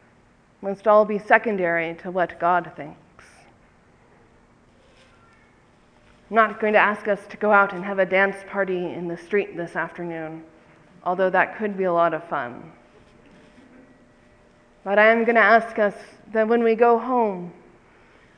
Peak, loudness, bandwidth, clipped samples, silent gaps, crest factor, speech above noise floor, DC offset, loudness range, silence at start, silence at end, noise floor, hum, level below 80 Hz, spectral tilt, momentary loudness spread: 0 dBFS; -21 LUFS; 9.8 kHz; under 0.1%; none; 22 dB; 36 dB; under 0.1%; 9 LU; 0.6 s; 0.85 s; -57 dBFS; none; -64 dBFS; -7 dB/octave; 17 LU